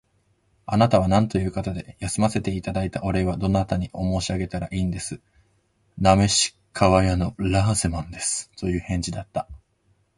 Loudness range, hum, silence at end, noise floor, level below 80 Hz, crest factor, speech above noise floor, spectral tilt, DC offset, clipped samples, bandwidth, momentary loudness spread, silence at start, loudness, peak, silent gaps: 4 LU; none; 0.6 s; -66 dBFS; -38 dBFS; 22 dB; 43 dB; -5 dB/octave; under 0.1%; under 0.1%; 11.5 kHz; 12 LU; 0.7 s; -23 LUFS; -2 dBFS; none